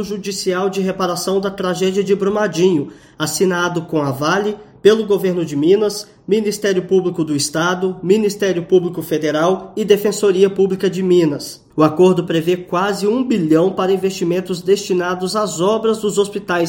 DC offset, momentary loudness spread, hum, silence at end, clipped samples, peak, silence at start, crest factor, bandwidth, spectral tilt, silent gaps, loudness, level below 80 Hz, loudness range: under 0.1%; 6 LU; none; 0 s; under 0.1%; 0 dBFS; 0 s; 16 dB; 17 kHz; -5 dB/octave; none; -17 LUFS; -56 dBFS; 2 LU